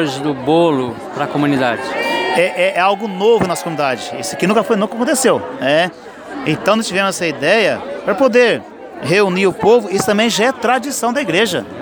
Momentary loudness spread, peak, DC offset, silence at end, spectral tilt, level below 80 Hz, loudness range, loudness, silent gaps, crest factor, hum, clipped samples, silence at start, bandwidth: 8 LU; 0 dBFS; under 0.1%; 0 s; -4 dB/octave; -54 dBFS; 2 LU; -15 LUFS; none; 14 dB; none; under 0.1%; 0 s; over 20 kHz